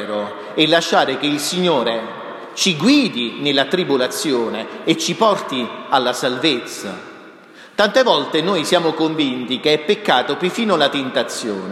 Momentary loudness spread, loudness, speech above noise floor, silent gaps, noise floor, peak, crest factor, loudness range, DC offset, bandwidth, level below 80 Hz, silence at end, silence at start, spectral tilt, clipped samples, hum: 10 LU; -17 LUFS; 24 dB; none; -42 dBFS; 0 dBFS; 18 dB; 2 LU; under 0.1%; 15 kHz; -70 dBFS; 0 s; 0 s; -3.5 dB/octave; under 0.1%; none